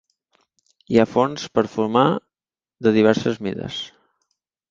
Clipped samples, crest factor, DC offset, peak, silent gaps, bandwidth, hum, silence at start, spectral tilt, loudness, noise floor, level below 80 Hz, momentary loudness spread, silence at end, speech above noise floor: under 0.1%; 20 dB; under 0.1%; -2 dBFS; none; 7.6 kHz; none; 0.9 s; -6 dB/octave; -20 LUFS; under -90 dBFS; -58 dBFS; 12 LU; 0.85 s; over 71 dB